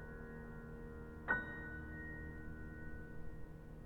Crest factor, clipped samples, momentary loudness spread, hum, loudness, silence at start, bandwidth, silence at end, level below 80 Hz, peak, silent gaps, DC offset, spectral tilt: 24 dB; under 0.1%; 14 LU; none; -47 LUFS; 0 s; 19.5 kHz; 0 s; -54 dBFS; -24 dBFS; none; under 0.1%; -8 dB/octave